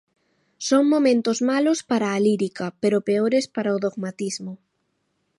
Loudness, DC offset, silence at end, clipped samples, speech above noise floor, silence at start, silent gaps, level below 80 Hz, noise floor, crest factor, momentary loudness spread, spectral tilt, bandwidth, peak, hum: -22 LUFS; under 0.1%; 0.85 s; under 0.1%; 51 dB; 0.6 s; none; -72 dBFS; -72 dBFS; 16 dB; 11 LU; -5 dB/octave; 11.5 kHz; -8 dBFS; none